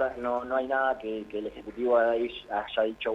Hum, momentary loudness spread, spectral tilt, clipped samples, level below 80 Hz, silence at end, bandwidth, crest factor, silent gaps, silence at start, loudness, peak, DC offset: none; 11 LU; -5.5 dB/octave; under 0.1%; -58 dBFS; 0 s; 7.4 kHz; 16 dB; none; 0 s; -29 LUFS; -12 dBFS; under 0.1%